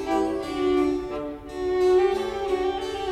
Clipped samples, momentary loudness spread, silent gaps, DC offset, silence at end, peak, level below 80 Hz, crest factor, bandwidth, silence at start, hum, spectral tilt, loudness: under 0.1%; 11 LU; none; under 0.1%; 0 s; -12 dBFS; -46 dBFS; 12 dB; 11.5 kHz; 0 s; none; -5.5 dB/octave; -25 LUFS